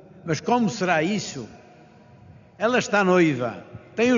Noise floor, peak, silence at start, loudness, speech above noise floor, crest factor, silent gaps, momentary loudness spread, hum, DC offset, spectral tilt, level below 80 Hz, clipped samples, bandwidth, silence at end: -50 dBFS; -6 dBFS; 0.15 s; -23 LUFS; 28 dB; 18 dB; none; 16 LU; none; under 0.1%; -4.5 dB/octave; -64 dBFS; under 0.1%; 7.4 kHz; 0 s